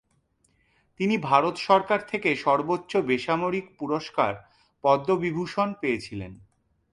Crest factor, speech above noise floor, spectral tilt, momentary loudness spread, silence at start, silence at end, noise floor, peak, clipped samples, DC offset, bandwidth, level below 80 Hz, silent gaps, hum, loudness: 22 dB; 44 dB; -6 dB/octave; 9 LU; 1 s; 0.55 s; -68 dBFS; -4 dBFS; under 0.1%; under 0.1%; 11.5 kHz; -60 dBFS; none; none; -25 LUFS